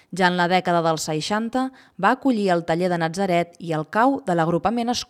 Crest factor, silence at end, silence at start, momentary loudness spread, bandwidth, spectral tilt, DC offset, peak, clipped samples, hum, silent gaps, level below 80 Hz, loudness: 18 dB; 0.05 s; 0.1 s; 5 LU; 15.5 kHz; -5 dB/octave; under 0.1%; -4 dBFS; under 0.1%; none; none; -58 dBFS; -22 LUFS